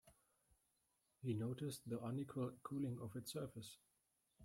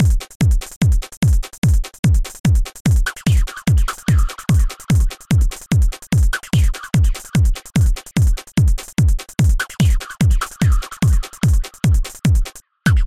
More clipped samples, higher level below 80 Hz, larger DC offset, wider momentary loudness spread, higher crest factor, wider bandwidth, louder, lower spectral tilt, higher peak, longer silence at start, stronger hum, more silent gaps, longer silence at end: neither; second, -80 dBFS vs -18 dBFS; neither; first, 8 LU vs 1 LU; about the same, 16 dB vs 12 dB; about the same, 16 kHz vs 15.5 kHz; second, -48 LUFS vs -18 LUFS; about the same, -6.5 dB/octave vs -5.5 dB/octave; second, -34 dBFS vs -4 dBFS; about the same, 0.05 s vs 0 s; neither; second, none vs 0.35-0.40 s, 0.76-0.81 s, 1.17-1.21 s, 1.58-1.62 s, 1.99-2.03 s, 2.40-2.44 s, 2.80-2.85 s; about the same, 0 s vs 0 s